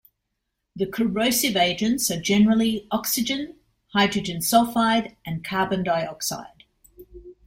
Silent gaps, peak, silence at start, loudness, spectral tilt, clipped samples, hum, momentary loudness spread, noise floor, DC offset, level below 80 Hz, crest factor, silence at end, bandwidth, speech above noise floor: none; -4 dBFS; 0.75 s; -22 LUFS; -3.5 dB/octave; under 0.1%; none; 10 LU; -79 dBFS; under 0.1%; -54 dBFS; 20 dB; 0.15 s; 16.5 kHz; 56 dB